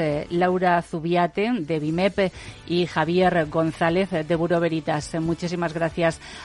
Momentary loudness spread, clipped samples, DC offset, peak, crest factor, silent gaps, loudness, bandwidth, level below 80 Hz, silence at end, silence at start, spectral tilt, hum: 6 LU; under 0.1%; under 0.1%; -8 dBFS; 16 dB; none; -23 LUFS; 11.5 kHz; -48 dBFS; 0 s; 0 s; -6.5 dB/octave; none